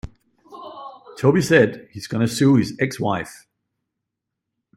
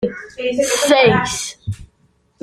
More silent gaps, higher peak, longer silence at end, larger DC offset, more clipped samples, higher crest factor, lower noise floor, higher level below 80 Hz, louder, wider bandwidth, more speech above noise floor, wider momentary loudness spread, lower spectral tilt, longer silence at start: neither; about the same, 0 dBFS vs -2 dBFS; first, 1.45 s vs 0.6 s; neither; neither; about the same, 20 dB vs 16 dB; first, -82 dBFS vs -59 dBFS; second, -52 dBFS vs -46 dBFS; second, -19 LUFS vs -16 LUFS; about the same, 14 kHz vs 15 kHz; first, 63 dB vs 42 dB; first, 23 LU vs 18 LU; first, -6 dB/octave vs -3.5 dB/octave; about the same, 0.05 s vs 0 s